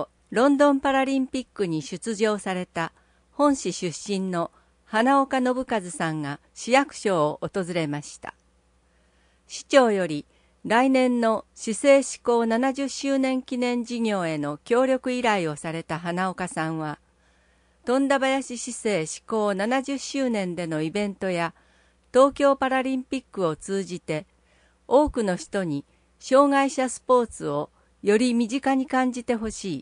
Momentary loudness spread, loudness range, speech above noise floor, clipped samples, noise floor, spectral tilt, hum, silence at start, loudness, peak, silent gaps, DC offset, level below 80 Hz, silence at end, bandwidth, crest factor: 12 LU; 4 LU; 39 dB; under 0.1%; -63 dBFS; -5 dB/octave; none; 0 s; -24 LUFS; -4 dBFS; none; under 0.1%; -56 dBFS; 0 s; 10.5 kHz; 22 dB